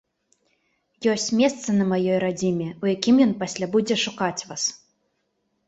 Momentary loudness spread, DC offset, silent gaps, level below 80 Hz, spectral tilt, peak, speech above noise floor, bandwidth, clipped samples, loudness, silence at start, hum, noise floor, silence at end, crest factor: 8 LU; under 0.1%; none; -64 dBFS; -4.5 dB/octave; -4 dBFS; 51 dB; 8.2 kHz; under 0.1%; -23 LUFS; 1 s; none; -73 dBFS; 0.9 s; 20 dB